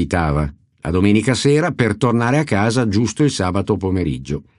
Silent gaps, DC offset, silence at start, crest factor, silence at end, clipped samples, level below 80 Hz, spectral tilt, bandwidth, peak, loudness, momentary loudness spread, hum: none; under 0.1%; 0 s; 16 dB; 0.2 s; under 0.1%; -36 dBFS; -6 dB/octave; 11.5 kHz; -2 dBFS; -17 LUFS; 7 LU; none